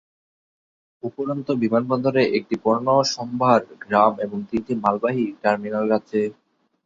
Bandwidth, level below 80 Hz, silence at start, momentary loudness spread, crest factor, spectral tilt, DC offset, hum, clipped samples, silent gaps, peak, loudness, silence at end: 7.8 kHz; -60 dBFS; 1.05 s; 9 LU; 20 dB; -5.5 dB/octave; under 0.1%; none; under 0.1%; none; -2 dBFS; -21 LUFS; 0.55 s